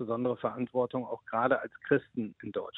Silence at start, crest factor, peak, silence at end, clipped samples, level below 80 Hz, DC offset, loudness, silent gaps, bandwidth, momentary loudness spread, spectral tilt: 0 s; 20 dB; -12 dBFS; 0 s; under 0.1%; -72 dBFS; under 0.1%; -32 LUFS; none; 4.1 kHz; 9 LU; -9.5 dB/octave